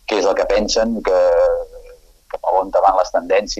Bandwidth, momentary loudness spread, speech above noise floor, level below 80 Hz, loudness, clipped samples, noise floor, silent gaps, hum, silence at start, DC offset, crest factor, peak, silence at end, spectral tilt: 8.2 kHz; 10 LU; 28 dB; -38 dBFS; -16 LUFS; under 0.1%; -43 dBFS; none; none; 0.1 s; under 0.1%; 16 dB; -2 dBFS; 0 s; -3 dB/octave